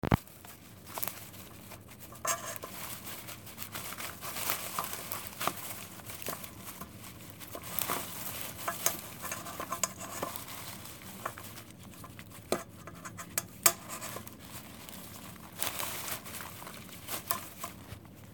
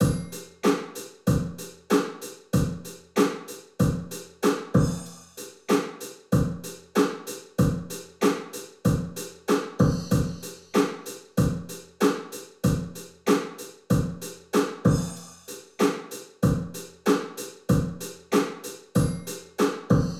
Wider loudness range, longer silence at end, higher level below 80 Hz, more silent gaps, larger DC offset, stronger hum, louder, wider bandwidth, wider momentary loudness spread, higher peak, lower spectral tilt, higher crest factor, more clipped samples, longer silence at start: first, 5 LU vs 1 LU; about the same, 0 s vs 0 s; second, -58 dBFS vs -44 dBFS; neither; neither; neither; second, -37 LUFS vs -27 LUFS; about the same, 19 kHz vs 17.5 kHz; about the same, 15 LU vs 14 LU; about the same, -6 dBFS vs -6 dBFS; second, -2.5 dB/octave vs -6 dB/octave; first, 34 dB vs 20 dB; neither; about the same, 0.05 s vs 0 s